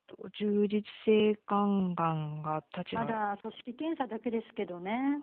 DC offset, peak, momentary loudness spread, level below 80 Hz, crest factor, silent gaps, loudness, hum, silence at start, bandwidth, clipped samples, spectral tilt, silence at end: under 0.1%; -16 dBFS; 10 LU; -72 dBFS; 16 dB; none; -32 LUFS; none; 0.1 s; 4.3 kHz; under 0.1%; -5.5 dB/octave; 0 s